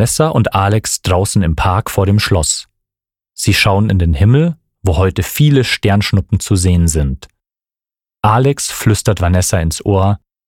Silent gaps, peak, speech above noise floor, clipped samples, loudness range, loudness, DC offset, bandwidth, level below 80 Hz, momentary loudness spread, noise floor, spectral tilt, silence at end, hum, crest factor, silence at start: none; 0 dBFS; over 78 dB; under 0.1%; 2 LU; -13 LUFS; 0.2%; 17 kHz; -28 dBFS; 6 LU; under -90 dBFS; -5 dB/octave; 0.3 s; none; 14 dB; 0 s